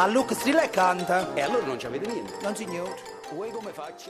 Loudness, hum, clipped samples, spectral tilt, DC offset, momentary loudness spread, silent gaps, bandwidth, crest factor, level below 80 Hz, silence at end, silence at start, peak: -27 LUFS; none; under 0.1%; -4 dB/octave; under 0.1%; 13 LU; none; 14 kHz; 18 dB; -64 dBFS; 0 s; 0 s; -8 dBFS